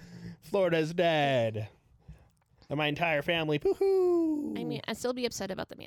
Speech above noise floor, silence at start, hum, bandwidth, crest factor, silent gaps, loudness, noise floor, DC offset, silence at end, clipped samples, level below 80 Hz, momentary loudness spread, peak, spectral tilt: 33 dB; 0 s; none; 17.5 kHz; 16 dB; none; -29 LUFS; -62 dBFS; under 0.1%; 0.05 s; under 0.1%; -62 dBFS; 11 LU; -14 dBFS; -5.5 dB/octave